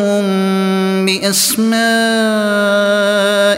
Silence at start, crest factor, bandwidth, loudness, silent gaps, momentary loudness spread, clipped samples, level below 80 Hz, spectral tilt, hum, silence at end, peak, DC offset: 0 s; 12 dB; 16.5 kHz; -13 LUFS; none; 2 LU; under 0.1%; -60 dBFS; -3.5 dB/octave; none; 0 s; -2 dBFS; under 0.1%